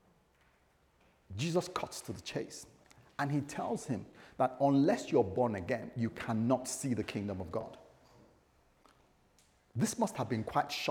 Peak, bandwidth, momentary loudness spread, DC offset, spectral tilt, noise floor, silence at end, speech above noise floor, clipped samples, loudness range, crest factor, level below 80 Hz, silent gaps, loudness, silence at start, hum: -16 dBFS; 19.5 kHz; 14 LU; under 0.1%; -5.5 dB/octave; -70 dBFS; 0 s; 36 dB; under 0.1%; 8 LU; 20 dB; -68 dBFS; none; -35 LUFS; 1.3 s; none